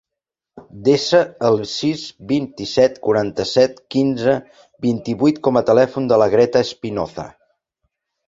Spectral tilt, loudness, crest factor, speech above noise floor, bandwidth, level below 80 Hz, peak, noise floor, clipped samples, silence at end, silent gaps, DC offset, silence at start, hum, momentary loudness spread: -5.5 dB/octave; -18 LUFS; 16 dB; 67 dB; 7.8 kHz; -54 dBFS; -2 dBFS; -85 dBFS; under 0.1%; 0.95 s; none; under 0.1%; 0.55 s; none; 10 LU